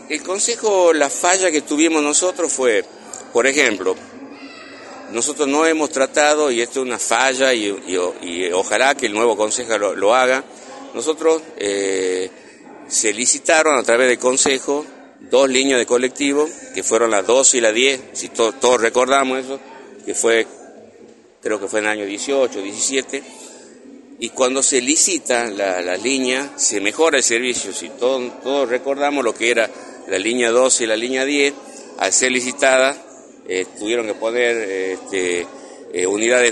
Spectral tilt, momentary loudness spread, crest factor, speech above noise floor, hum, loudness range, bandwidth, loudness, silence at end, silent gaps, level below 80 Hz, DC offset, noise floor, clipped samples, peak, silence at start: -1 dB/octave; 13 LU; 18 dB; 28 dB; none; 4 LU; 11.5 kHz; -17 LUFS; 0 s; none; -66 dBFS; under 0.1%; -45 dBFS; under 0.1%; 0 dBFS; 0 s